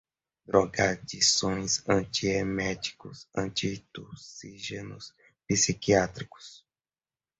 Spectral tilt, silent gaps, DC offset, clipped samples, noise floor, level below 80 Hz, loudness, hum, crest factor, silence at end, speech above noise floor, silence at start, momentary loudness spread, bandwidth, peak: -3 dB/octave; none; under 0.1%; under 0.1%; under -90 dBFS; -54 dBFS; -27 LUFS; none; 22 dB; 0.8 s; over 61 dB; 0.5 s; 21 LU; 8.4 kHz; -8 dBFS